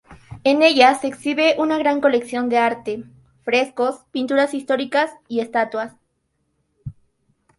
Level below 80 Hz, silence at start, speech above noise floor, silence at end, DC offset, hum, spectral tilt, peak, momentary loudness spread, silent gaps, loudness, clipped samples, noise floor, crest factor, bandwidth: -58 dBFS; 0.1 s; 52 dB; 0.65 s; under 0.1%; none; -4 dB/octave; 0 dBFS; 17 LU; none; -19 LUFS; under 0.1%; -70 dBFS; 20 dB; 11.5 kHz